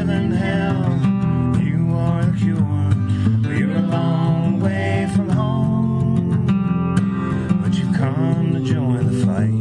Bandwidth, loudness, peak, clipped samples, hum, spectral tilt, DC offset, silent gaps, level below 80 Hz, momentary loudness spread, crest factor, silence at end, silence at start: 11 kHz; -19 LUFS; -4 dBFS; under 0.1%; none; -8.5 dB/octave; under 0.1%; none; -44 dBFS; 1 LU; 14 dB; 0 s; 0 s